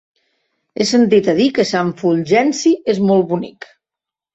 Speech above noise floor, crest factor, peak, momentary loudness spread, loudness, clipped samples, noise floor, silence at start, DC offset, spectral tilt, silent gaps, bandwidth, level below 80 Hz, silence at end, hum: 72 dB; 14 dB; -2 dBFS; 8 LU; -15 LUFS; under 0.1%; -86 dBFS; 0.75 s; under 0.1%; -5.5 dB/octave; none; 8.2 kHz; -58 dBFS; 0.85 s; none